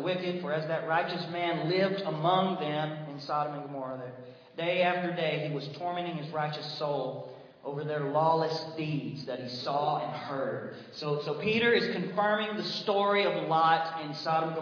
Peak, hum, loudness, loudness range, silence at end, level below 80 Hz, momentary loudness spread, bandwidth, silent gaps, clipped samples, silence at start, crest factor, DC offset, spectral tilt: -12 dBFS; none; -30 LUFS; 5 LU; 0 s; -80 dBFS; 12 LU; 5.4 kHz; none; under 0.1%; 0 s; 18 dB; under 0.1%; -6.5 dB/octave